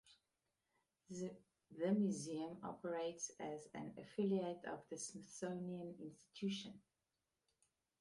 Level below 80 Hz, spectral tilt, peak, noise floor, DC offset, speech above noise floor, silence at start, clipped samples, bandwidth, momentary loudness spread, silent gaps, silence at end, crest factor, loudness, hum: -84 dBFS; -5.5 dB/octave; -28 dBFS; under -90 dBFS; under 0.1%; over 45 dB; 0.05 s; under 0.1%; 11.5 kHz; 15 LU; none; 1.2 s; 20 dB; -46 LUFS; none